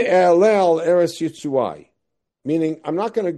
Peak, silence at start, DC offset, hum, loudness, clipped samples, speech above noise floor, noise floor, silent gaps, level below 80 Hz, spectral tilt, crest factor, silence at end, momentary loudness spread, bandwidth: -4 dBFS; 0 s; under 0.1%; none; -18 LUFS; under 0.1%; 60 dB; -78 dBFS; none; -68 dBFS; -6 dB/octave; 14 dB; 0 s; 11 LU; 12.5 kHz